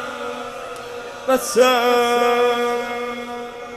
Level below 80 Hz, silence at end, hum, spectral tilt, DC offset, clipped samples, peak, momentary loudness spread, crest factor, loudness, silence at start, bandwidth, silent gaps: -56 dBFS; 0 s; none; -2 dB/octave; under 0.1%; under 0.1%; -2 dBFS; 16 LU; 18 dB; -19 LUFS; 0 s; 15.5 kHz; none